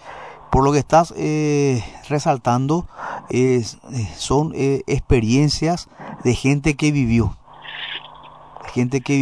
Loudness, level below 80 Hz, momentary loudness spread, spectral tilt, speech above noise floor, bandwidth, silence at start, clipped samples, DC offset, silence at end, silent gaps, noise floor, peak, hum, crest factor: -19 LUFS; -36 dBFS; 14 LU; -6 dB/octave; 24 dB; 11 kHz; 0.05 s; under 0.1%; 0.2%; 0 s; none; -42 dBFS; -4 dBFS; none; 16 dB